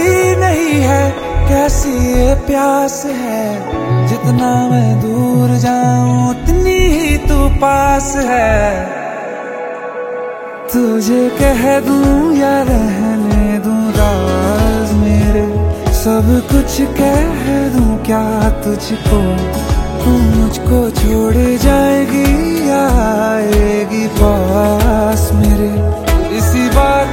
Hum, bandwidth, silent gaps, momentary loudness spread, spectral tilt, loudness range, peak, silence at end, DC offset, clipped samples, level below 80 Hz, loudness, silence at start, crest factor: none; 16.5 kHz; none; 6 LU; -6 dB/octave; 2 LU; 0 dBFS; 0 s; under 0.1%; under 0.1%; -18 dBFS; -13 LUFS; 0 s; 12 dB